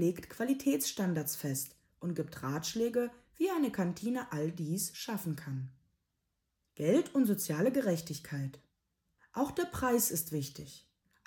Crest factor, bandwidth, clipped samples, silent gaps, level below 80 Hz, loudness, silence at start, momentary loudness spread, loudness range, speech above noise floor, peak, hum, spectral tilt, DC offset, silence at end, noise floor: 18 dB; 18 kHz; under 0.1%; none; -66 dBFS; -34 LUFS; 0 s; 11 LU; 3 LU; 49 dB; -16 dBFS; none; -5 dB/octave; under 0.1%; 0.5 s; -83 dBFS